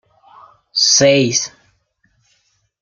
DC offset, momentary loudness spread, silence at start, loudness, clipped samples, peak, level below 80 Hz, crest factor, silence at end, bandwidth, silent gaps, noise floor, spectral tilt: under 0.1%; 12 LU; 0.75 s; -13 LUFS; under 0.1%; 0 dBFS; -60 dBFS; 18 dB; 1.35 s; 11 kHz; none; -62 dBFS; -2.5 dB/octave